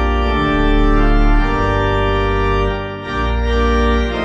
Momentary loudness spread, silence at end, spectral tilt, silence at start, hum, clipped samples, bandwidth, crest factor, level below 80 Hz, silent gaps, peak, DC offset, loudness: 5 LU; 0 s; -7 dB/octave; 0 s; none; under 0.1%; 7.4 kHz; 12 dB; -16 dBFS; none; -2 dBFS; under 0.1%; -16 LUFS